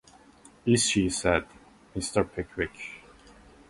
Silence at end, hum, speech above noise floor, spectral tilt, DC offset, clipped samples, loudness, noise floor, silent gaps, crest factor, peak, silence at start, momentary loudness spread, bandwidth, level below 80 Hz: 0.7 s; none; 28 dB; -4 dB/octave; under 0.1%; under 0.1%; -27 LUFS; -55 dBFS; none; 20 dB; -10 dBFS; 0.65 s; 17 LU; 11.5 kHz; -48 dBFS